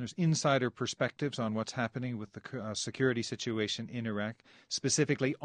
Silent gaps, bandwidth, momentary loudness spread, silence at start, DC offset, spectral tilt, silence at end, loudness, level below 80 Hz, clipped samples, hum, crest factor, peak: none; 10 kHz; 10 LU; 0 s; under 0.1%; -4.5 dB/octave; 0 s; -33 LUFS; -72 dBFS; under 0.1%; none; 18 dB; -14 dBFS